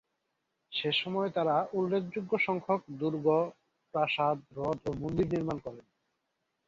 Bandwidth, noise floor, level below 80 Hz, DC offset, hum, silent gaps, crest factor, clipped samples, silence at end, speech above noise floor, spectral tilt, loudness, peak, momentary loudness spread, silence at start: 7.6 kHz; -82 dBFS; -62 dBFS; under 0.1%; none; none; 18 dB; under 0.1%; 0.85 s; 51 dB; -7 dB/octave; -32 LUFS; -14 dBFS; 8 LU; 0.7 s